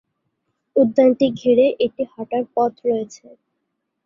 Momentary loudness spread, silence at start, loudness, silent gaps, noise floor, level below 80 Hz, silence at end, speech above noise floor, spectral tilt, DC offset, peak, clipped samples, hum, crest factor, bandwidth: 10 LU; 0.75 s; -19 LUFS; none; -76 dBFS; -62 dBFS; 0.9 s; 57 dB; -6.5 dB/octave; under 0.1%; -2 dBFS; under 0.1%; none; 16 dB; 7.4 kHz